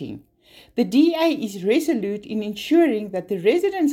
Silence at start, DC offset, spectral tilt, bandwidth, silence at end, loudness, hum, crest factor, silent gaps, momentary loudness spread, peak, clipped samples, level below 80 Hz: 0 s; under 0.1%; -5.5 dB/octave; 16.5 kHz; 0 s; -21 LUFS; none; 14 dB; none; 10 LU; -6 dBFS; under 0.1%; -62 dBFS